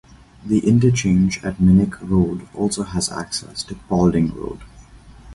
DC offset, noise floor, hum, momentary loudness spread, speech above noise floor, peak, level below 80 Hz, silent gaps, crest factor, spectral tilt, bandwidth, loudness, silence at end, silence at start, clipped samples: under 0.1%; -43 dBFS; none; 15 LU; 25 dB; -2 dBFS; -38 dBFS; none; 16 dB; -6 dB/octave; 11.5 kHz; -19 LUFS; 0 s; 0.45 s; under 0.1%